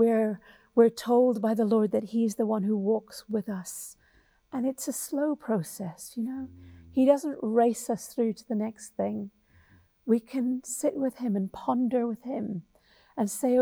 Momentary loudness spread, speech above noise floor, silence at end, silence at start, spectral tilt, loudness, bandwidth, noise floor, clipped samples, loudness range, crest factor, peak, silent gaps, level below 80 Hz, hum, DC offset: 14 LU; 37 dB; 0 s; 0 s; -6 dB/octave; -28 LUFS; over 20 kHz; -64 dBFS; under 0.1%; 6 LU; 18 dB; -10 dBFS; none; -68 dBFS; none; under 0.1%